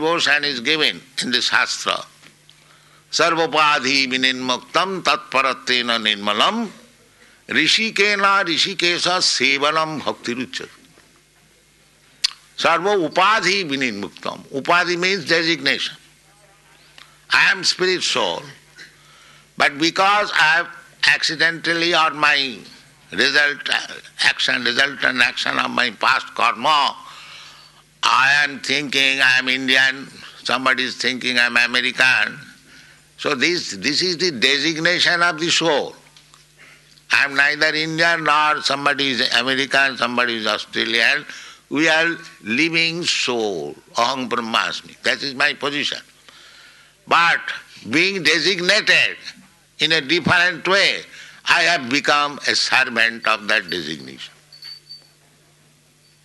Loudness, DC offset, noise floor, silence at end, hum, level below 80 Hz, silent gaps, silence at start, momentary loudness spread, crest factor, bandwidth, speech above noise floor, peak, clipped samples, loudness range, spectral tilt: -17 LUFS; under 0.1%; -55 dBFS; 1.3 s; none; -64 dBFS; none; 0 s; 12 LU; 18 dB; 12 kHz; 36 dB; -2 dBFS; under 0.1%; 4 LU; -2 dB/octave